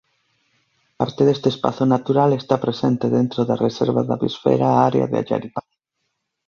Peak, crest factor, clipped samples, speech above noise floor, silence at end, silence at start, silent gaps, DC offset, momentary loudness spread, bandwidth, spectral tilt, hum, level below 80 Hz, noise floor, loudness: -2 dBFS; 18 dB; under 0.1%; 57 dB; 0.85 s; 1 s; none; under 0.1%; 8 LU; 7 kHz; -8 dB/octave; none; -58 dBFS; -75 dBFS; -19 LUFS